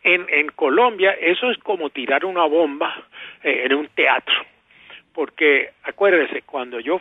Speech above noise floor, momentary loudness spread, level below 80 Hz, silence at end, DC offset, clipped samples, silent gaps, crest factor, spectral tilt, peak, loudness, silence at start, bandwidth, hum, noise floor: 26 dB; 11 LU; -72 dBFS; 0 s; under 0.1%; under 0.1%; none; 16 dB; -5.5 dB/octave; -2 dBFS; -19 LUFS; 0.05 s; 4 kHz; none; -46 dBFS